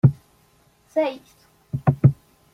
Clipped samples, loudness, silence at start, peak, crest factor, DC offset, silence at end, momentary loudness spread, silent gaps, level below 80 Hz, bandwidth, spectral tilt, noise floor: under 0.1%; -22 LUFS; 0.05 s; -2 dBFS; 20 dB; under 0.1%; 0.4 s; 23 LU; none; -52 dBFS; 6 kHz; -10 dB/octave; -59 dBFS